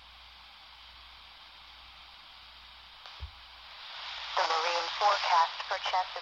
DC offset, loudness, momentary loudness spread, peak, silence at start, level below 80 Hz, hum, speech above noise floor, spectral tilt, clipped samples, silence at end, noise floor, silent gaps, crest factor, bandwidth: under 0.1%; -30 LUFS; 22 LU; -14 dBFS; 0 s; -60 dBFS; none; 23 dB; -0.5 dB/octave; under 0.1%; 0 s; -53 dBFS; none; 20 dB; 10.5 kHz